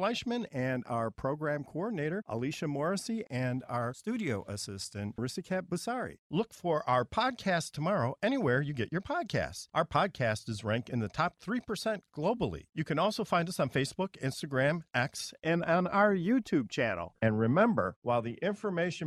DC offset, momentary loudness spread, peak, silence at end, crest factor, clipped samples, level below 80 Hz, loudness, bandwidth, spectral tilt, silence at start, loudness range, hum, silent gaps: under 0.1%; 7 LU; -12 dBFS; 0 s; 20 dB; under 0.1%; -62 dBFS; -32 LUFS; 14.5 kHz; -5.5 dB/octave; 0 s; 6 LU; none; 6.19-6.30 s, 17.96-18.02 s